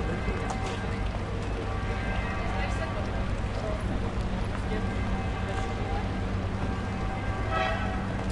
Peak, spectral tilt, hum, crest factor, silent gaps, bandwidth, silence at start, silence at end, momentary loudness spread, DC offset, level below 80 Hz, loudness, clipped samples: -16 dBFS; -6.5 dB/octave; none; 14 dB; none; 11 kHz; 0 s; 0 s; 2 LU; under 0.1%; -34 dBFS; -31 LUFS; under 0.1%